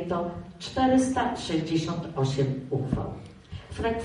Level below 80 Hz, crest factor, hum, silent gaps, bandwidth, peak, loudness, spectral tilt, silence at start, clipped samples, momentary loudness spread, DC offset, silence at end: -48 dBFS; 16 dB; none; none; 11 kHz; -12 dBFS; -28 LUFS; -6 dB/octave; 0 s; under 0.1%; 16 LU; under 0.1%; 0 s